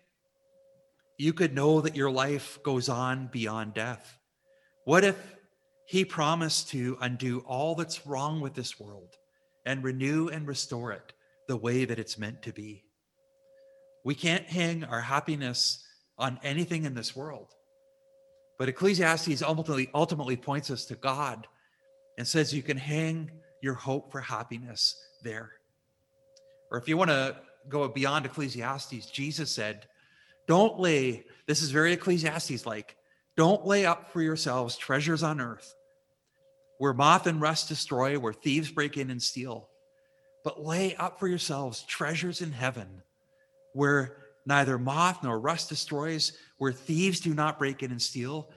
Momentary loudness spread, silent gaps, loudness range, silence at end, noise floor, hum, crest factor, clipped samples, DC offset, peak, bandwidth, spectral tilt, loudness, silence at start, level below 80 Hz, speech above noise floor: 14 LU; none; 6 LU; 0.1 s; -74 dBFS; none; 24 dB; under 0.1%; under 0.1%; -6 dBFS; 12.5 kHz; -4.5 dB/octave; -29 LUFS; 1.2 s; -72 dBFS; 45 dB